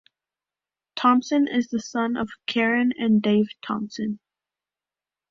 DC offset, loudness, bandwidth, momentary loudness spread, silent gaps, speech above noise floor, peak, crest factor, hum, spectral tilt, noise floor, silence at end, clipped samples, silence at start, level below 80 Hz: under 0.1%; -23 LUFS; 7.4 kHz; 10 LU; none; over 68 dB; -6 dBFS; 18 dB; none; -5.5 dB/octave; under -90 dBFS; 1.15 s; under 0.1%; 0.95 s; -66 dBFS